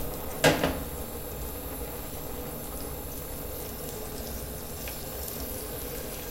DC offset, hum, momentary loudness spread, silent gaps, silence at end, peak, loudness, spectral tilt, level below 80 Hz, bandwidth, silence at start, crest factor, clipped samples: under 0.1%; none; 11 LU; none; 0 s; -8 dBFS; -33 LUFS; -4 dB/octave; -42 dBFS; 17 kHz; 0 s; 26 dB; under 0.1%